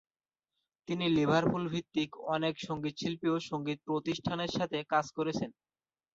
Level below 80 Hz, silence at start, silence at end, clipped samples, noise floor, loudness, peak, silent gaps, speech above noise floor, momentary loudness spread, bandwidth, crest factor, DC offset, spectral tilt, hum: -66 dBFS; 0.9 s; 0.65 s; under 0.1%; -89 dBFS; -33 LUFS; -16 dBFS; none; 56 dB; 8 LU; 7.8 kHz; 18 dB; under 0.1%; -6 dB/octave; none